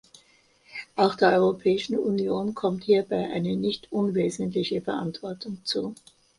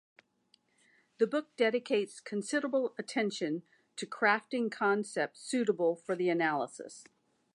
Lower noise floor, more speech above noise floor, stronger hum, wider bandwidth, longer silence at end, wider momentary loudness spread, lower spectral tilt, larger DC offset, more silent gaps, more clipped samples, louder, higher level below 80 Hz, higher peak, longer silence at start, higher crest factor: second, -61 dBFS vs -72 dBFS; about the same, 36 dB vs 39 dB; neither; about the same, 11.5 kHz vs 11 kHz; about the same, 0.45 s vs 0.5 s; about the same, 13 LU vs 12 LU; first, -6 dB/octave vs -4.5 dB/octave; neither; neither; neither; first, -26 LUFS vs -32 LUFS; first, -64 dBFS vs -90 dBFS; first, -6 dBFS vs -14 dBFS; second, 0.7 s vs 1.2 s; about the same, 20 dB vs 20 dB